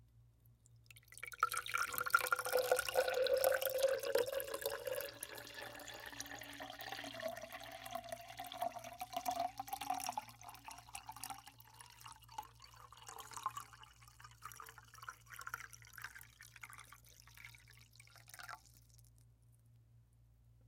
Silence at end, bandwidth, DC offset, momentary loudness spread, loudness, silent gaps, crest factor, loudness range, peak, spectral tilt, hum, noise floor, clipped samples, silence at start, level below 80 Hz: 0 s; 17 kHz; under 0.1%; 23 LU; -42 LUFS; none; 30 dB; 19 LU; -14 dBFS; -1.5 dB/octave; none; -68 dBFS; under 0.1%; 0.15 s; -72 dBFS